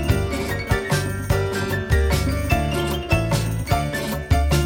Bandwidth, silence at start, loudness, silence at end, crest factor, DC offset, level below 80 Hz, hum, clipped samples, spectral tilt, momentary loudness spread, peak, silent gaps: 17.5 kHz; 0 s; -22 LUFS; 0 s; 16 dB; under 0.1%; -26 dBFS; none; under 0.1%; -5.5 dB/octave; 4 LU; -4 dBFS; none